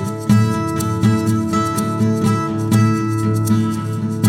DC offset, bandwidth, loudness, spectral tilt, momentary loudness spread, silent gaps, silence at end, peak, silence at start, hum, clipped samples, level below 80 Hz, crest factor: under 0.1%; 16.5 kHz; -17 LUFS; -6.5 dB/octave; 5 LU; none; 0 s; -2 dBFS; 0 s; none; under 0.1%; -46 dBFS; 14 dB